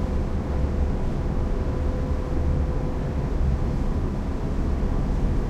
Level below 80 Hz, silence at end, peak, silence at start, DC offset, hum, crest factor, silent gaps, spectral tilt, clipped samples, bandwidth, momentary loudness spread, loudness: -26 dBFS; 0 s; -10 dBFS; 0 s; under 0.1%; none; 12 dB; none; -8.5 dB/octave; under 0.1%; 8.4 kHz; 2 LU; -27 LUFS